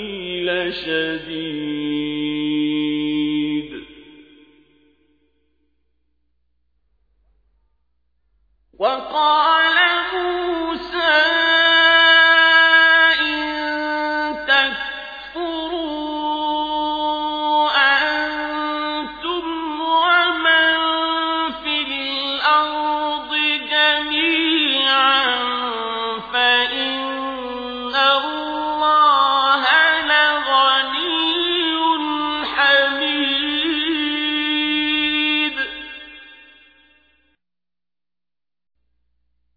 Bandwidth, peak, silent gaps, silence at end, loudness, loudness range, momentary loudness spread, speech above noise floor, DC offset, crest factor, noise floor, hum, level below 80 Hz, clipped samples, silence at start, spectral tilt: 5 kHz; -2 dBFS; none; 3.2 s; -17 LUFS; 10 LU; 12 LU; over 67 dB; under 0.1%; 18 dB; under -90 dBFS; none; -54 dBFS; under 0.1%; 0 s; -4 dB/octave